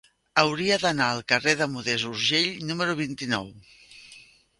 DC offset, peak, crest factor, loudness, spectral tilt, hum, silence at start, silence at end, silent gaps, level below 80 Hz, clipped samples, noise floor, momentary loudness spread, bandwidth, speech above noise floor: under 0.1%; -4 dBFS; 22 dB; -24 LUFS; -3.5 dB/octave; none; 0.35 s; 0.4 s; none; -62 dBFS; under 0.1%; -52 dBFS; 7 LU; 11.5 kHz; 27 dB